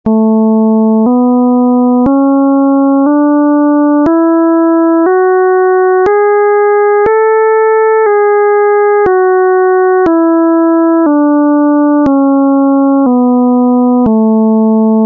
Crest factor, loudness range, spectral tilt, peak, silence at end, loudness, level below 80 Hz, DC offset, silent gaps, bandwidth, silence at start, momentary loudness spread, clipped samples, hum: 6 dB; 0 LU; -11 dB/octave; -2 dBFS; 0 s; -8 LUFS; -46 dBFS; under 0.1%; none; 2.6 kHz; 0.05 s; 0 LU; under 0.1%; none